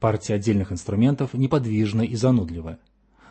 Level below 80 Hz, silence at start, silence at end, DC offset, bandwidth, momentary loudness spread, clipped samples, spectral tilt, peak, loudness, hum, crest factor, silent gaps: -48 dBFS; 0 s; 0.55 s; under 0.1%; 8.8 kHz; 8 LU; under 0.1%; -7.5 dB/octave; -6 dBFS; -23 LUFS; none; 16 dB; none